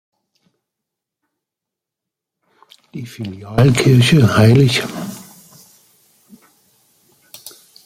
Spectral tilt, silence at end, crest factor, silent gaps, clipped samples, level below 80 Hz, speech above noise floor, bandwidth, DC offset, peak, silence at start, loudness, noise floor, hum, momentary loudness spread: -6 dB/octave; 0.35 s; 16 dB; none; under 0.1%; -46 dBFS; 71 dB; 16 kHz; under 0.1%; -2 dBFS; 2.95 s; -12 LUFS; -84 dBFS; none; 26 LU